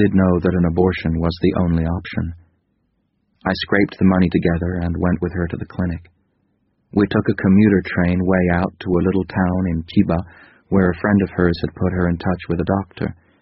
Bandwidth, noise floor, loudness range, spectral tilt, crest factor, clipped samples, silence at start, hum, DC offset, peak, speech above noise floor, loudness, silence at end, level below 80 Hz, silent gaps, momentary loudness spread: 5.8 kHz; -67 dBFS; 4 LU; -7 dB/octave; 18 dB; under 0.1%; 0 s; none; under 0.1%; -2 dBFS; 49 dB; -19 LUFS; 0.3 s; -38 dBFS; none; 9 LU